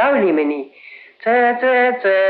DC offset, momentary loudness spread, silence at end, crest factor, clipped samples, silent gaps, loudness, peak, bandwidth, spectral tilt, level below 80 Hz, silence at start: under 0.1%; 11 LU; 0 s; 12 dB; under 0.1%; none; -16 LUFS; -4 dBFS; 4.9 kHz; -8.5 dB/octave; -70 dBFS; 0 s